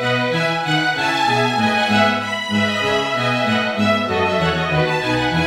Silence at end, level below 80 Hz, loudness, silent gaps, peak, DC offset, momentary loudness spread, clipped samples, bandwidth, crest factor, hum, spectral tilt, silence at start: 0 s; -46 dBFS; -17 LUFS; none; -2 dBFS; under 0.1%; 3 LU; under 0.1%; 16 kHz; 16 dB; none; -5 dB/octave; 0 s